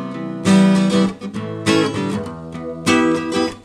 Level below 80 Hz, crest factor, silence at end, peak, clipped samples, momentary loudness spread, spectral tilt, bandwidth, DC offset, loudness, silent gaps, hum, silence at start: -50 dBFS; 14 dB; 0.05 s; -2 dBFS; under 0.1%; 14 LU; -5.5 dB/octave; 12.5 kHz; under 0.1%; -17 LUFS; none; none; 0 s